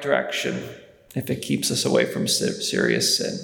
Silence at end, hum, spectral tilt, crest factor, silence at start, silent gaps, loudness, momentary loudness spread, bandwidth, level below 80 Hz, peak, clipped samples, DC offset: 0 s; none; -3 dB/octave; 18 dB; 0 s; none; -22 LUFS; 12 LU; 19.5 kHz; -64 dBFS; -4 dBFS; under 0.1%; under 0.1%